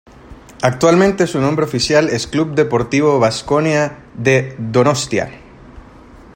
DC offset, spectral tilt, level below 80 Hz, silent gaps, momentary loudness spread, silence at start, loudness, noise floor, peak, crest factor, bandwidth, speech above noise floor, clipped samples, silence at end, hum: under 0.1%; -5.5 dB/octave; -44 dBFS; none; 7 LU; 0.3 s; -15 LUFS; -40 dBFS; 0 dBFS; 16 dB; 16.5 kHz; 25 dB; under 0.1%; 0.55 s; none